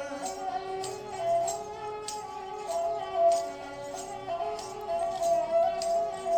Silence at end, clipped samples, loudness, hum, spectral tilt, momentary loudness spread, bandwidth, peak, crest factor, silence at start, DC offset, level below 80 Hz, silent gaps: 0 s; under 0.1%; -31 LUFS; none; -3 dB/octave; 12 LU; 18.5 kHz; -16 dBFS; 16 dB; 0 s; under 0.1%; -62 dBFS; none